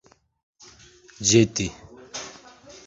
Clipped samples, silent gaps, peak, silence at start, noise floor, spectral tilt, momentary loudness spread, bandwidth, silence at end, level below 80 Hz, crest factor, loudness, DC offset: under 0.1%; none; -4 dBFS; 1.2 s; -51 dBFS; -4 dB/octave; 19 LU; 8 kHz; 0.55 s; -52 dBFS; 22 dB; -21 LUFS; under 0.1%